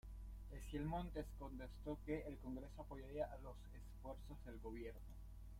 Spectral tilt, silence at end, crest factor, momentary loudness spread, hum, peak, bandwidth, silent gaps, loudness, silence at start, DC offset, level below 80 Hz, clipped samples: -7.5 dB/octave; 0 s; 18 dB; 11 LU; none; -32 dBFS; 16 kHz; none; -52 LUFS; 0.05 s; under 0.1%; -56 dBFS; under 0.1%